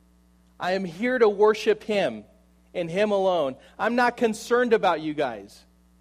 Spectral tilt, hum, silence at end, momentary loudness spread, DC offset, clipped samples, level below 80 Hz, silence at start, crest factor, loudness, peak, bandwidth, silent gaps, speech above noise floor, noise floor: -5 dB/octave; none; 0.55 s; 11 LU; under 0.1%; under 0.1%; -62 dBFS; 0.6 s; 18 dB; -24 LUFS; -8 dBFS; 14.5 kHz; none; 35 dB; -59 dBFS